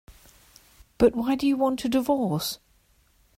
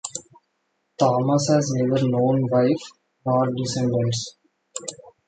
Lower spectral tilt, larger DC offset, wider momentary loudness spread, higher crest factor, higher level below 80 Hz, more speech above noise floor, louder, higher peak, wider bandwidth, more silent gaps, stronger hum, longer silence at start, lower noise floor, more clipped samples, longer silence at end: about the same, -5.5 dB/octave vs -6 dB/octave; neither; second, 8 LU vs 16 LU; about the same, 20 dB vs 18 dB; first, -50 dBFS vs -60 dBFS; second, 39 dB vs 52 dB; about the same, -24 LUFS vs -22 LUFS; second, -8 dBFS vs -4 dBFS; first, 16 kHz vs 9.4 kHz; neither; neither; about the same, 0.1 s vs 0.05 s; second, -63 dBFS vs -73 dBFS; neither; first, 0.8 s vs 0.2 s